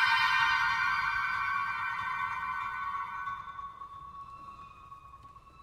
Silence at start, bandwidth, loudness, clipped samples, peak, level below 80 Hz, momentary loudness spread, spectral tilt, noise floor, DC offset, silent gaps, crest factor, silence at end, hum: 0 s; 15.5 kHz; -30 LUFS; under 0.1%; -14 dBFS; -62 dBFS; 24 LU; -1 dB/octave; -53 dBFS; under 0.1%; none; 20 dB; 0 s; none